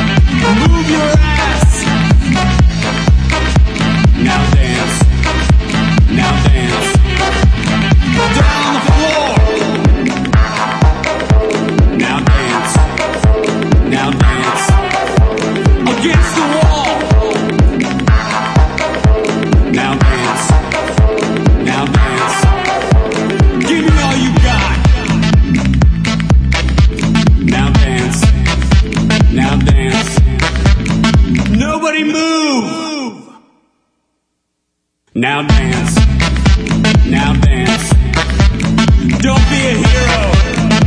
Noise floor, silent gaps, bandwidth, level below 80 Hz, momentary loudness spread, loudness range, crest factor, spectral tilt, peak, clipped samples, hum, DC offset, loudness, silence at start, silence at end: -69 dBFS; none; 11 kHz; -14 dBFS; 3 LU; 2 LU; 10 dB; -5.5 dB/octave; 0 dBFS; under 0.1%; none; under 0.1%; -11 LUFS; 0 s; 0 s